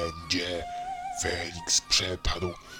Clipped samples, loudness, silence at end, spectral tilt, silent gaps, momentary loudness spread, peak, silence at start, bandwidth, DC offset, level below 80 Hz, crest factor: under 0.1%; -28 LUFS; 0 s; -2 dB/octave; none; 12 LU; -10 dBFS; 0 s; 17.5 kHz; under 0.1%; -42 dBFS; 20 dB